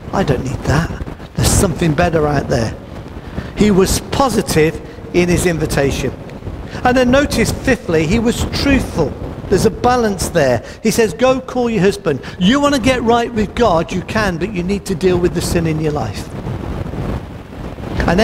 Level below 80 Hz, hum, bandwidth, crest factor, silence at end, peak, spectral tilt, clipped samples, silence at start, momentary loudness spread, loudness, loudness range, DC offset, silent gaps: -28 dBFS; none; 16 kHz; 14 dB; 0 s; 0 dBFS; -5.5 dB/octave; under 0.1%; 0 s; 13 LU; -16 LUFS; 3 LU; under 0.1%; none